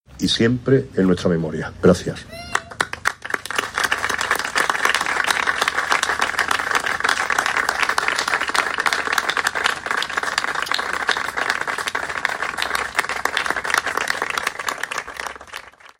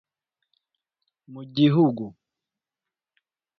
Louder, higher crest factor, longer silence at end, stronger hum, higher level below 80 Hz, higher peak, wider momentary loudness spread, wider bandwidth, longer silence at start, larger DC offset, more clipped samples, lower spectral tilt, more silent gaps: about the same, -20 LUFS vs -21 LUFS; about the same, 20 dB vs 22 dB; second, 0.15 s vs 1.5 s; neither; first, -50 dBFS vs -66 dBFS; first, 0 dBFS vs -6 dBFS; second, 8 LU vs 20 LU; first, 16.5 kHz vs 6 kHz; second, 0.1 s vs 1.3 s; neither; neither; second, -3.5 dB/octave vs -9.5 dB/octave; neither